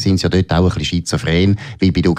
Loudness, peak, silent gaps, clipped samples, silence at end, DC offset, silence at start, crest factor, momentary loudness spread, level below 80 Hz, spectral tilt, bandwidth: -16 LUFS; -2 dBFS; none; under 0.1%; 0 s; under 0.1%; 0 s; 12 dB; 4 LU; -32 dBFS; -6 dB/octave; 13 kHz